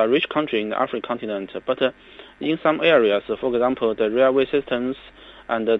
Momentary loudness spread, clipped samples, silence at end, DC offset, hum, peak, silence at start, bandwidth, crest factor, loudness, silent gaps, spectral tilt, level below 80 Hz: 11 LU; under 0.1%; 0 s; under 0.1%; none; -4 dBFS; 0 s; 5.6 kHz; 18 dB; -21 LUFS; none; -7.5 dB/octave; -56 dBFS